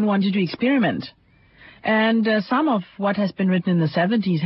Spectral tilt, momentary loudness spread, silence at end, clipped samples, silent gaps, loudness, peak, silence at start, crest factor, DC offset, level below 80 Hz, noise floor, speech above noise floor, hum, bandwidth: -11 dB/octave; 6 LU; 0 s; under 0.1%; none; -21 LUFS; -8 dBFS; 0 s; 14 dB; under 0.1%; -62 dBFS; -50 dBFS; 30 dB; none; 5.8 kHz